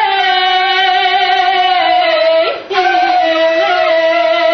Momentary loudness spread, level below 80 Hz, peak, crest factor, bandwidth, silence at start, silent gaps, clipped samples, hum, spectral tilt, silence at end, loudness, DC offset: 1 LU; -54 dBFS; 0 dBFS; 10 dB; 6.4 kHz; 0 s; none; under 0.1%; none; -2 dB/octave; 0 s; -11 LUFS; under 0.1%